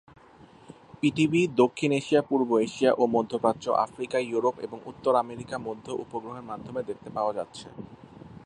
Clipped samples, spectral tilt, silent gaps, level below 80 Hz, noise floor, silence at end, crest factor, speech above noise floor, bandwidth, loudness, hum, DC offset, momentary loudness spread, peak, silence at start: under 0.1%; -6 dB/octave; none; -64 dBFS; -53 dBFS; 0.1 s; 20 dB; 26 dB; 10.5 kHz; -27 LUFS; none; under 0.1%; 15 LU; -8 dBFS; 0.7 s